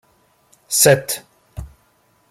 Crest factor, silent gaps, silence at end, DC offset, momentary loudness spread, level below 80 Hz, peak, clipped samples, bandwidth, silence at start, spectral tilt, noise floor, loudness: 22 dB; none; 0.65 s; under 0.1%; 24 LU; -46 dBFS; 0 dBFS; under 0.1%; 16.5 kHz; 0.7 s; -2.5 dB/octave; -59 dBFS; -16 LUFS